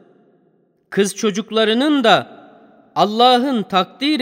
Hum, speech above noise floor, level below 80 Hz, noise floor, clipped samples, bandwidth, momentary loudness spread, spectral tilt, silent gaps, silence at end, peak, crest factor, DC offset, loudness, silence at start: none; 44 dB; -70 dBFS; -59 dBFS; under 0.1%; 16 kHz; 8 LU; -4 dB/octave; none; 0 s; 0 dBFS; 18 dB; under 0.1%; -16 LUFS; 0.9 s